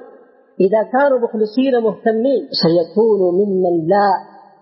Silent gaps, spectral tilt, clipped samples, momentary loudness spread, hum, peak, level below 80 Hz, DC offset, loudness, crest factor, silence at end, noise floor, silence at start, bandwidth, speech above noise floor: none; -10.5 dB/octave; under 0.1%; 3 LU; none; -4 dBFS; -68 dBFS; under 0.1%; -15 LUFS; 12 dB; 0.4 s; -45 dBFS; 0 s; 5.8 kHz; 30 dB